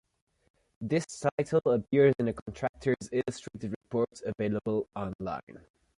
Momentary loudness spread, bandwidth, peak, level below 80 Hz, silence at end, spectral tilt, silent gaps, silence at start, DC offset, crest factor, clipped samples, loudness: 13 LU; 11.5 kHz; -12 dBFS; -60 dBFS; 0.45 s; -6.5 dB/octave; 1.32-1.38 s, 2.42-2.46 s, 2.69-2.74 s, 3.76-3.81 s, 5.15-5.19 s, 5.43-5.47 s; 0.8 s; under 0.1%; 20 dB; under 0.1%; -31 LUFS